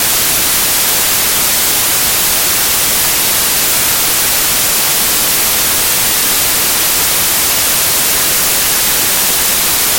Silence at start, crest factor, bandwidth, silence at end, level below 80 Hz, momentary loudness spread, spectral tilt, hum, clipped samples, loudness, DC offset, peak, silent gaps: 0 s; 12 dB; 17 kHz; 0 s; -36 dBFS; 0 LU; 0 dB/octave; none; under 0.1%; -9 LUFS; under 0.1%; 0 dBFS; none